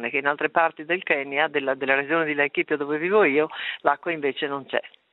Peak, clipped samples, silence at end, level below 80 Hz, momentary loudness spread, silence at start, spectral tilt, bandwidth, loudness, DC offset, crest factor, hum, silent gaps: -2 dBFS; under 0.1%; 0.25 s; -74 dBFS; 7 LU; 0 s; -8 dB/octave; 4.1 kHz; -23 LUFS; under 0.1%; 22 dB; none; none